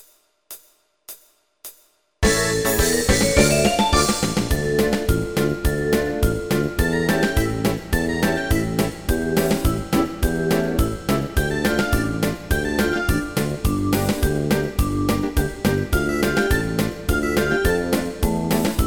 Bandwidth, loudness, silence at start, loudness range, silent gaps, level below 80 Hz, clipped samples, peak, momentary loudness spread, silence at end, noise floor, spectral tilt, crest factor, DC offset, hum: over 20 kHz; -21 LUFS; 0 s; 3 LU; none; -28 dBFS; under 0.1%; 0 dBFS; 6 LU; 0 s; -58 dBFS; -5 dB/octave; 20 dB; 0.6%; none